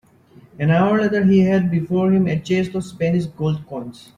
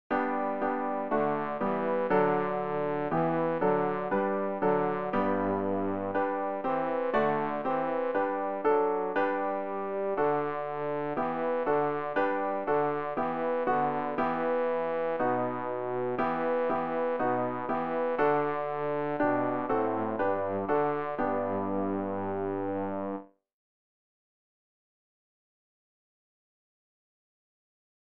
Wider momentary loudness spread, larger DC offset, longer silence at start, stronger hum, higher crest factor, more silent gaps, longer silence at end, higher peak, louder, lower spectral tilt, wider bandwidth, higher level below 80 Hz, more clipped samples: first, 10 LU vs 5 LU; second, under 0.1% vs 0.4%; first, 0.6 s vs 0.1 s; neither; about the same, 14 dB vs 16 dB; neither; second, 0.25 s vs 4.6 s; first, -4 dBFS vs -14 dBFS; first, -18 LUFS vs -30 LUFS; second, -8 dB/octave vs -9.5 dB/octave; first, 9.6 kHz vs 5.2 kHz; first, -52 dBFS vs -66 dBFS; neither